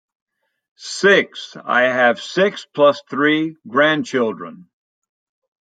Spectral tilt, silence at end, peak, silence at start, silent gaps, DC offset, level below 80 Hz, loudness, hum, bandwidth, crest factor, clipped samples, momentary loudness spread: -4 dB/octave; 1.2 s; -2 dBFS; 0.8 s; none; under 0.1%; -72 dBFS; -17 LUFS; none; 9.2 kHz; 18 dB; under 0.1%; 15 LU